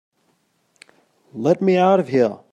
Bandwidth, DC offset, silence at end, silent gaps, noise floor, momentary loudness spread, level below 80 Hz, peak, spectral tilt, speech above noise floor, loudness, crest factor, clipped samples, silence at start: 9.4 kHz; under 0.1%; 0.15 s; none; -65 dBFS; 8 LU; -68 dBFS; -4 dBFS; -7.5 dB/octave; 48 dB; -18 LUFS; 16 dB; under 0.1%; 1.35 s